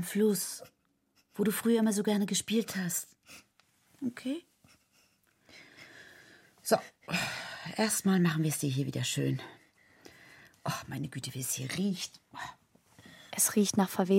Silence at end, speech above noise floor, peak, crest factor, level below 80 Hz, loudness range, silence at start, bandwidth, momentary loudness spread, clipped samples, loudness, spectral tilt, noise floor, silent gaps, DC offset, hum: 0 s; 41 dB; -12 dBFS; 22 dB; -72 dBFS; 9 LU; 0 s; 16.5 kHz; 19 LU; under 0.1%; -32 LUFS; -4.5 dB/octave; -72 dBFS; none; under 0.1%; none